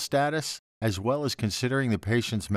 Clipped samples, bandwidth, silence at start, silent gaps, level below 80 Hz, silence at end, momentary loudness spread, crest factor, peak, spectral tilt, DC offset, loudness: under 0.1%; 15 kHz; 0 s; 0.59-0.81 s; -56 dBFS; 0 s; 5 LU; 14 dB; -12 dBFS; -5 dB/octave; under 0.1%; -28 LUFS